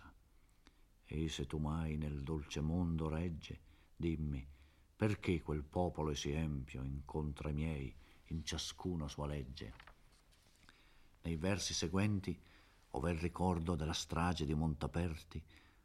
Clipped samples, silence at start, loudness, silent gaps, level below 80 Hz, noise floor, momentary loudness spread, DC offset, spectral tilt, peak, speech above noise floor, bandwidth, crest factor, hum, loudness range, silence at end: under 0.1%; 0 s; -41 LUFS; none; -52 dBFS; -68 dBFS; 12 LU; under 0.1%; -5.5 dB/octave; -22 dBFS; 28 dB; 14 kHz; 20 dB; none; 5 LU; 0.25 s